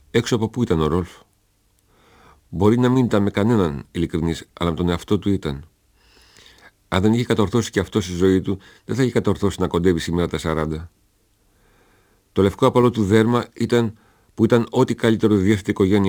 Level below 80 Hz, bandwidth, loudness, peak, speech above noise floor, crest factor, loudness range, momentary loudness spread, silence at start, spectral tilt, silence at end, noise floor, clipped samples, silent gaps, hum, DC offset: -42 dBFS; over 20 kHz; -20 LUFS; -2 dBFS; 43 dB; 18 dB; 5 LU; 9 LU; 0.15 s; -6.5 dB/octave; 0 s; -62 dBFS; under 0.1%; none; none; under 0.1%